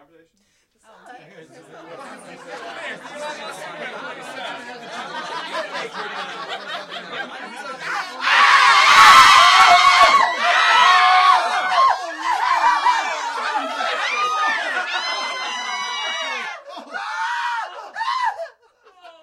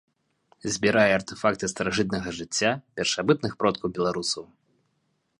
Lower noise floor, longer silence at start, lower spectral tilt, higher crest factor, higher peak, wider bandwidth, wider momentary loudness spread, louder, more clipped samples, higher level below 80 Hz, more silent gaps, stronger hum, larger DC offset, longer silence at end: second, -64 dBFS vs -73 dBFS; first, 1.1 s vs 0.65 s; second, 0.5 dB/octave vs -4 dB/octave; about the same, 18 dB vs 22 dB; first, 0 dBFS vs -4 dBFS; first, 16.5 kHz vs 11.5 kHz; first, 22 LU vs 8 LU; first, -15 LUFS vs -25 LUFS; neither; about the same, -60 dBFS vs -56 dBFS; neither; neither; neither; second, 0.75 s vs 0.95 s